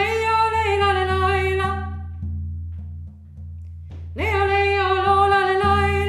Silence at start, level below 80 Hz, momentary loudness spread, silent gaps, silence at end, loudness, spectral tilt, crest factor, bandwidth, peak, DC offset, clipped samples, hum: 0 s; -34 dBFS; 20 LU; none; 0 s; -19 LUFS; -6 dB/octave; 14 dB; 12 kHz; -6 dBFS; under 0.1%; under 0.1%; none